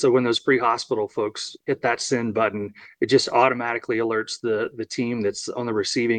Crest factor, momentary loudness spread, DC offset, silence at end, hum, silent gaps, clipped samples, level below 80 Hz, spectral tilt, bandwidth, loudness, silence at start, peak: 20 dB; 9 LU; under 0.1%; 0 s; none; none; under 0.1%; -68 dBFS; -4 dB/octave; 10 kHz; -23 LUFS; 0 s; -4 dBFS